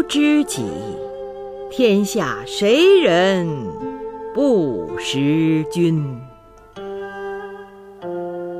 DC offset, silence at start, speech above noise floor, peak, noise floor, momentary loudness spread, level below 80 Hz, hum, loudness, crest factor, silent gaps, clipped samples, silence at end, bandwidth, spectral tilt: under 0.1%; 0 s; 26 dB; -4 dBFS; -43 dBFS; 18 LU; -52 dBFS; none; -18 LUFS; 16 dB; none; under 0.1%; 0 s; 15.5 kHz; -5.5 dB/octave